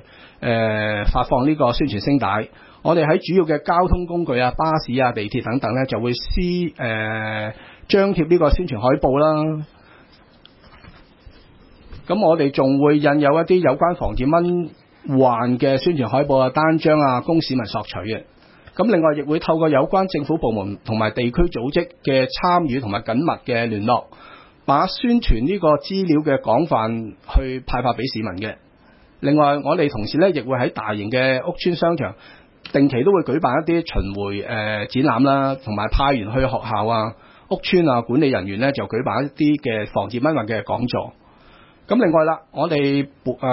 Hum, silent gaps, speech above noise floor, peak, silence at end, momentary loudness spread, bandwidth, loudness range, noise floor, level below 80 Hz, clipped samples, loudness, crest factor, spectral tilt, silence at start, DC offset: none; none; 32 dB; -2 dBFS; 0 s; 9 LU; 5.8 kHz; 4 LU; -51 dBFS; -34 dBFS; under 0.1%; -19 LUFS; 16 dB; -11 dB/octave; 0.4 s; under 0.1%